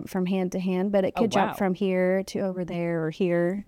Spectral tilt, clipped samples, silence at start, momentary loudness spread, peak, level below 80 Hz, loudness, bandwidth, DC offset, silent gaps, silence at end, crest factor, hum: -7 dB/octave; under 0.1%; 0 s; 5 LU; -10 dBFS; -58 dBFS; -26 LUFS; 16 kHz; under 0.1%; none; 0.05 s; 16 dB; none